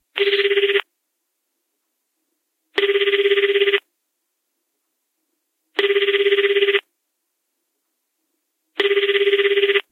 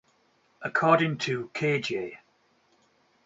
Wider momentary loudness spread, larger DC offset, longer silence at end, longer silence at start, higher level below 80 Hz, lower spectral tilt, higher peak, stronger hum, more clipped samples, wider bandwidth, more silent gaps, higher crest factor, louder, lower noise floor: second, 6 LU vs 13 LU; neither; second, 0.1 s vs 1.1 s; second, 0.15 s vs 0.6 s; second, -80 dBFS vs -72 dBFS; second, -1.5 dB/octave vs -5.5 dB/octave; first, -2 dBFS vs -8 dBFS; neither; neither; second, 5.2 kHz vs 8 kHz; neither; about the same, 20 dB vs 22 dB; first, -18 LUFS vs -27 LUFS; first, -75 dBFS vs -67 dBFS